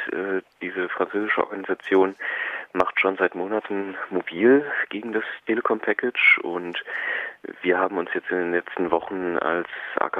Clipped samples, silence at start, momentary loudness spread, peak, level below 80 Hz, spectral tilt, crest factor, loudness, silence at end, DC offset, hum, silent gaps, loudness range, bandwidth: under 0.1%; 0 s; 10 LU; -2 dBFS; -68 dBFS; -6.5 dB/octave; 22 dB; -24 LUFS; 0 s; under 0.1%; none; none; 4 LU; 5.8 kHz